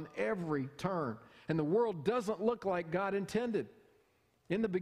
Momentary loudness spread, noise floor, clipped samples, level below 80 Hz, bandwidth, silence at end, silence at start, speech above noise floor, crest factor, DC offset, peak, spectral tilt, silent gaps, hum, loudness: 7 LU; -73 dBFS; under 0.1%; -68 dBFS; 14 kHz; 0 s; 0 s; 38 dB; 18 dB; under 0.1%; -18 dBFS; -7 dB/octave; none; none; -36 LUFS